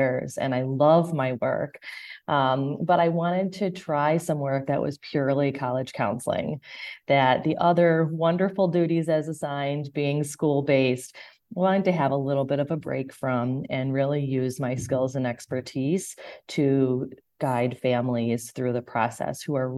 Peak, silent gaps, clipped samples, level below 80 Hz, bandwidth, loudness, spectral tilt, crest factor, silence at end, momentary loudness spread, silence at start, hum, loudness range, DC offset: -6 dBFS; none; under 0.1%; -62 dBFS; 12.5 kHz; -25 LUFS; -6.5 dB/octave; 18 dB; 0 s; 10 LU; 0 s; none; 4 LU; under 0.1%